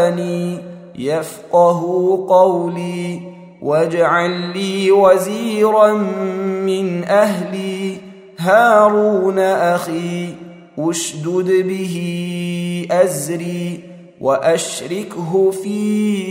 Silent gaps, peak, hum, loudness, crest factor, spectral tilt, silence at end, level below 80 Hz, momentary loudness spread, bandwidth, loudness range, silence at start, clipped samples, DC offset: none; 0 dBFS; none; -16 LUFS; 16 dB; -5.5 dB/octave; 0 s; -64 dBFS; 13 LU; 16 kHz; 4 LU; 0 s; under 0.1%; under 0.1%